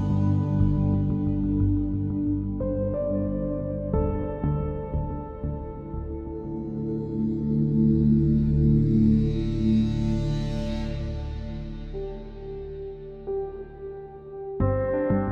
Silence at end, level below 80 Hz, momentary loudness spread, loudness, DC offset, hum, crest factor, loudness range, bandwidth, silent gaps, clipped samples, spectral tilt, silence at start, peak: 0 s; -34 dBFS; 16 LU; -26 LUFS; under 0.1%; none; 14 dB; 11 LU; 6.8 kHz; none; under 0.1%; -10 dB/octave; 0 s; -10 dBFS